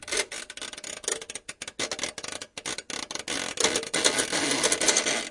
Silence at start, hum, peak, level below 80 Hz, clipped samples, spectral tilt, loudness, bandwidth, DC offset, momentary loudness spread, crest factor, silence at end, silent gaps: 0 s; none; -4 dBFS; -62 dBFS; under 0.1%; -0.5 dB/octave; -27 LUFS; 11.5 kHz; under 0.1%; 14 LU; 26 dB; 0 s; none